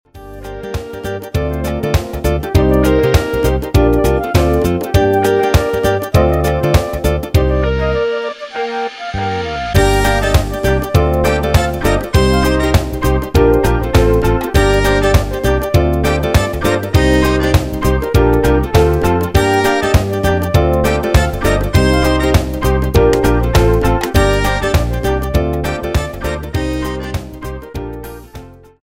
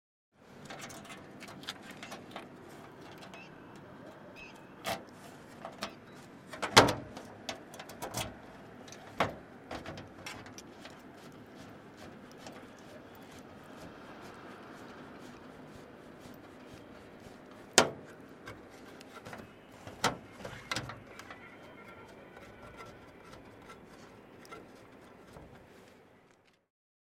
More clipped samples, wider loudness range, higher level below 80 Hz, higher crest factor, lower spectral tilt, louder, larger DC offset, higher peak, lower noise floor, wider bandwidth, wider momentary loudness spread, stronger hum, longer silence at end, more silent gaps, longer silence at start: neither; second, 3 LU vs 20 LU; first, -20 dBFS vs -66 dBFS; second, 14 dB vs 40 dB; first, -6 dB/octave vs -2.5 dB/octave; first, -14 LUFS vs -35 LUFS; neither; about the same, 0 dBFS vs 0 dBFS; second, -35 dBFS vs -66 dBFS; about the same, 16.5 kHz vs 16.5 kHz; second, 9 LU vs 17 LU; neither; second, 0.4 s vs 0.7 s; neither; second, 0.15 s vs 0.4 s